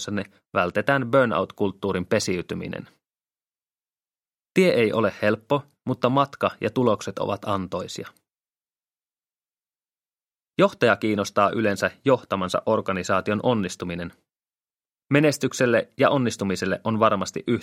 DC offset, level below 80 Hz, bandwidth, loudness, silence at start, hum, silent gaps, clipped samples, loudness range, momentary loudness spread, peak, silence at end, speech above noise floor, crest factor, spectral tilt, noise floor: under 0.1%; -62 dBFS; 16 kHz; -23 LUFS; 0 s; none; none; under 0.1%; 6 LU; 11 LU; -2 dBFS; 0 s; over 67 dB; 22 dB; -5.5 dB/octave; under -90 dBFS